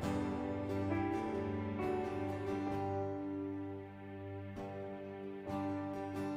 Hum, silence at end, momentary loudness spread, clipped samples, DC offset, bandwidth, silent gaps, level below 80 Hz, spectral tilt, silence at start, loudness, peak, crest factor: none; 0 s; 9 LU; under 0.1%; under 0.1%; 15 kHz; none; -60 dBFS; -8 dB/octave; 0 s; -40 LUFS; -24 dBFS; 14 dB